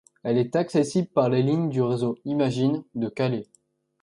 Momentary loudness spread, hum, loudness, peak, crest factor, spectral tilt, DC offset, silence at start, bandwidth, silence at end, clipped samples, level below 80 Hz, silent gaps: 5 LU; none; -25 LUFS; -6 dBFS; 18 dB; -7.5 dB/octave; under 0.1%; 0.25 s; 11.5 kHz; 0.6 s; under 0.1%; -66 dBFS; none